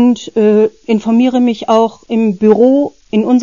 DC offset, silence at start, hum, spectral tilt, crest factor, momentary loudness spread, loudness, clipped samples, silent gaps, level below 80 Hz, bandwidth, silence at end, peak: 0.3%; 0 s; none; -7 dB/octave; 10 dB; 6 LU; -12 LUFS; under 0.1%; none; -54 dBFS; 7.4 kHz; 0 s; 0 dBFS